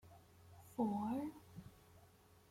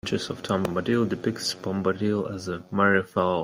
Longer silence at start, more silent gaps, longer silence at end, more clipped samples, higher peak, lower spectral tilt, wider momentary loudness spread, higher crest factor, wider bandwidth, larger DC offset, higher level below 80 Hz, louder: about the same, 0.05 s vs 0.05 s; neither; first, 0.45 s vs 0 s; neither; second, -26 dBFS vs -8 dBFS; first, -7.5 dB/octave vs -5.5 dB/octave; first, 25 LU vs 8 LU; about the same, 20 dB vs 18 dB; about the same, 16.5 kHz vs 16 kHz; neither; second, -74 dBFS vs -60 dBFS; second, -43 LUFS vs -26 LUFS